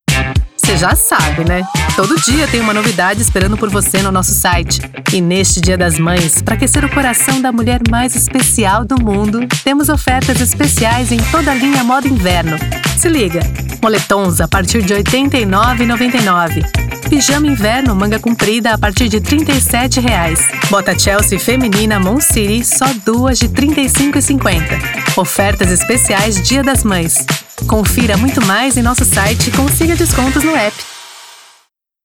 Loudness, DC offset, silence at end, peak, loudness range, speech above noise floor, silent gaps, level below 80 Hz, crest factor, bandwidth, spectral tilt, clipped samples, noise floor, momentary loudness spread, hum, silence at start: -11 LUFS; 0.2%; 0.7 s; 0 dBFS; 1 LU; 43 dB; none; -24 dBFS; 12 dB; over 20 kHz; -4 dB/octave; under 0.1%; -54 dBFS; 4 LU; none; 0.1 s